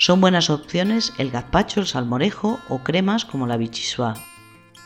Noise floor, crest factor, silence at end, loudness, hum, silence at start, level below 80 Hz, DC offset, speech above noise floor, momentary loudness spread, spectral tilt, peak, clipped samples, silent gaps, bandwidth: -47 dBFS; 20 dB; 0.05 s; -21 LUFS; none; 0 s; -44 dBFS; under 0.1%; 26 dB; 9 LU; -5 dB/octave; -2 dBFS; under 0.1%; none; 15.5 kHz